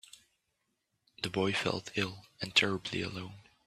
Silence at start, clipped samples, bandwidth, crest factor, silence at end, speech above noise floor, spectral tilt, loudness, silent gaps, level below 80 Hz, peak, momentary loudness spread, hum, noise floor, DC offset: 1.2 s; under 0.1%; 14 kHz; 26 dB; 0.25 s; 47 dB; -4 dB/octave; -33 LUFS; none; -68 dBFS; -10 dBFS; 14 LU; none; -81 dBFS; under 0.1%